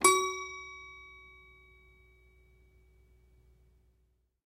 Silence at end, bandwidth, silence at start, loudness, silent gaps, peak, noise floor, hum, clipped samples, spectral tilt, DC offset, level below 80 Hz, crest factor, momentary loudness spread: 3.4 s; 15.5 kHz; 0 s; -32 LUFS; none; -8 dBFS; -73 dBFS; none; under 0.1%; -0.5 dB/octave; under 0.1%; -64 dBFS; 30 dB; 28 LU